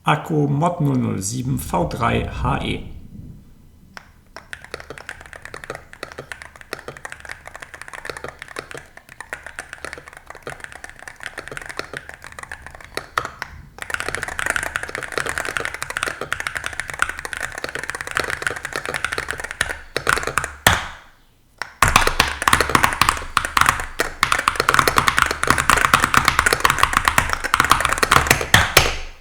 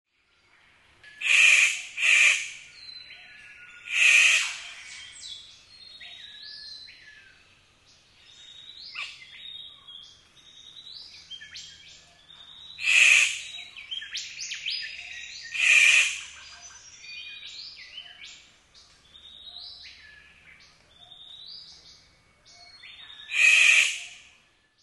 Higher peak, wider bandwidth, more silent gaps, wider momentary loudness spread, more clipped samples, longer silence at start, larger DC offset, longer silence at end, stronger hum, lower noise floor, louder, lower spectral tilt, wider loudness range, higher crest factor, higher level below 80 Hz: first, 0 dBFS vs -6 dBFS; first, over 20 kHz vs 12 kHz; neither; second, 20 LU vs 28 LU; neither; second, 0.05 s vs 1.2 s; neither; second, 0 s vs 0.7 s; neither; second, -53 dBFS vs -65 dBFS; about the same, -19 LUFS vs -19 LUFS; first, -3 dB/octave vs 4 dB/octave; second, 18 LU vs 23 LU; about the same, 22 dB vs 22 dB; first, -36 dBFS vs -70 dBFS